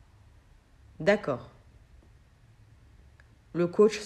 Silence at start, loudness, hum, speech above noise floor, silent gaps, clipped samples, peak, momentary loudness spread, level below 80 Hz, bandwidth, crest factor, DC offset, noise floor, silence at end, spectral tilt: 1 s; -28 LUFS; none; 32 dB; none; under 0.1%; -10 dBFS; 14 LU; -58 dBFS; 10 kHz; 22 dB; under 0.1%; -58 dBFS; 0 s; -6 dB/octave